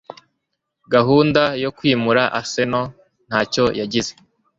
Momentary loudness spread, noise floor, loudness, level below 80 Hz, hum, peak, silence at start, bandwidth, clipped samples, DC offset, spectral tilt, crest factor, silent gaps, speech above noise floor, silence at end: 9 LU; -76 dBFS; -18 LUFS; -52 dBFS; none; -2 dBFS; 0.1 s; 7.8 kHz; under 0.1%; under 0.1%; -5 dB/octave; 18 dB; none; 58 dB; 0.5 s